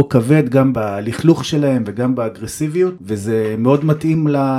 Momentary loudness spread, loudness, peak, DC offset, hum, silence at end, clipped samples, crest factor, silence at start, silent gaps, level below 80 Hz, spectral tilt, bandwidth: 8 LU; -16 LUFS; 0 dBFS; under 0.1%; none; 0 s; under 0.1%; 16 dB; 0 s; none; -50 dBFS; -7 dB/octave; 15 kHz